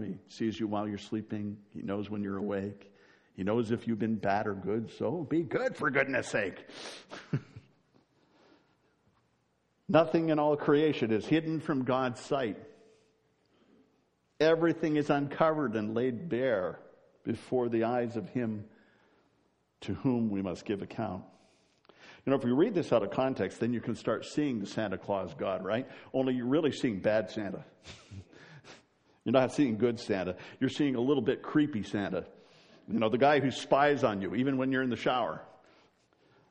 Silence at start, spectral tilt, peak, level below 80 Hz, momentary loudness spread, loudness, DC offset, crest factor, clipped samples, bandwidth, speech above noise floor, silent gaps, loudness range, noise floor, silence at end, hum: 0 s; -6.5 dB/octave; -10 dBFS; -70 dBFS; 13 LU; -31 LUFS; under 0.1%; 22 dB; under 0.1%; 10 kHz; 44 dB; none; 7 LU; -74 dBFS; 1 s; none